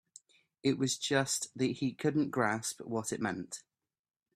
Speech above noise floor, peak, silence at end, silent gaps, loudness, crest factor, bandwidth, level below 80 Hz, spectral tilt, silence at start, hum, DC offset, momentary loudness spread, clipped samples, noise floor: 28 dB; -14 dBFS; 0.75 s; none; -33 LUFS; 20 dB; 15.5 kHz; -74 dBFS; -4 dB/octave; 0.65 s; none; under 0.1%; 7 LU; under 0.1%; -61 dBFS